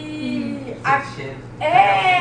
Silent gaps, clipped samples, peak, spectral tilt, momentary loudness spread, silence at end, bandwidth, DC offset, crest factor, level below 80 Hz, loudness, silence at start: none; under 0.1%; -2 dBFS; -5 dB/octave; 16 LU; 0 s; 10 kHz; under 0.1%; 18 dB; -50 dBFS; -19 LUFS; 0 s